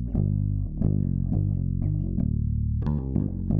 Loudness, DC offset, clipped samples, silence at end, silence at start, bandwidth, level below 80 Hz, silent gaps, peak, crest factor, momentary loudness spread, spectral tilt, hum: -27 LUFS; under 0.1%; under 0.1%; 0 s; 0 s; 1.9 kHz; -32 dBFS; none; -10 dBFS; 16 dB; 2 LU; -13.5 dB/octave; none